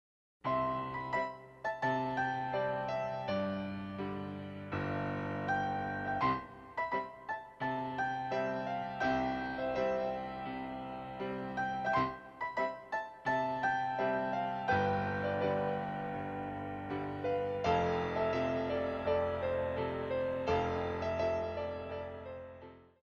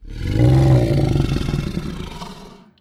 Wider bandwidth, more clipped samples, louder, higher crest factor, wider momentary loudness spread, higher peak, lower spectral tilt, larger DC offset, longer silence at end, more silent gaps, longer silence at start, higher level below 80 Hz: second, 7.8 kHz vs 12 kHz; neither; second, -36 LUFS vs -18 LUFS; first, 18 dB vs 12 dB; second, 9 LU vs 18 LU; second, -18 dBFS vs -6 dBFS; about the same, -7 dB/octave vs -8 dB/octave; neither; about the same, 0.2 s vs 0.3 s; neither; first, 0.45 s vs 0 s; second, -60 dBFS vs -28 dBFS